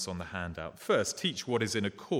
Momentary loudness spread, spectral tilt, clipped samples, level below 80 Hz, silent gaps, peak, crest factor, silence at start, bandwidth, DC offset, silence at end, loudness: 9 LU; -4 dB/octave; under 0.1%; -60 dBFS; none; -16 dBFS; 16 dB; 0 s; 18 kHz; under 0.1%; 0 s; -32 LUFS